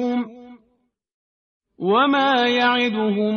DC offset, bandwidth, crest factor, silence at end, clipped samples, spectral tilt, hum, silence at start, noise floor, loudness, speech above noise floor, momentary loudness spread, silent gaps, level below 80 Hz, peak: under 0.1%; 6.6 kHz; 14 dB; 0 s; under 0.1%; -2 dB/octave; none; 0 s; -68 dBFS; -19 LUFS; 49 dB; 10 LU; 1.14-1.60 s; -66 dBFS; -6 dBFS